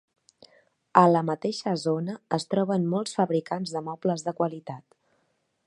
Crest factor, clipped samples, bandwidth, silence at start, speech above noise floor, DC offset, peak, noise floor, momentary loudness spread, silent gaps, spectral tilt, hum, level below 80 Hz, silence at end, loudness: 26 dB; under 0.1%; 11 kHz; 0.95 s; 47 dB; under 0.1%; -2 dBFS; -73 dBFS; 11 LU; none; -6.5 dB/octave; none; -74 dBFS; 0.9 s; -26 LUFS